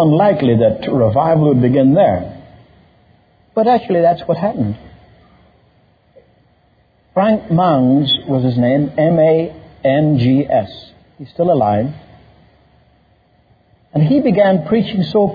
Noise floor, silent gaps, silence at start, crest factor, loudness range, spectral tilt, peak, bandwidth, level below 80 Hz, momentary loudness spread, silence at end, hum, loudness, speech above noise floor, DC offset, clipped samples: -55 dBFS; none; 0 s; 14 dB; 7 LU; -10 dB/octave; -2 dBFS; 5 kHz; -48 dBFS; 11 LU; 0 s; none; -14 LUFS; 42 dB; under 0.1%; under 0.1%